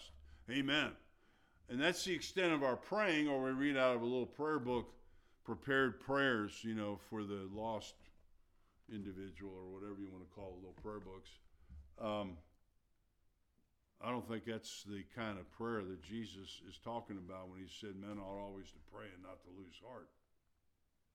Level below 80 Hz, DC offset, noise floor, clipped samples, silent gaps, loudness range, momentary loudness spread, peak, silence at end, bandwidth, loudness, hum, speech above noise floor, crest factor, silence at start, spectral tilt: -68 dBFS; under 0.1%; -80 dBFS; under 0.1%; none; 15 LU; 21 LU; -20 dBFS; 1.1 s; 16 kHz; -41 LUFS; none; 38 dB; 22 dB; 0 s; -4.5 dB/octave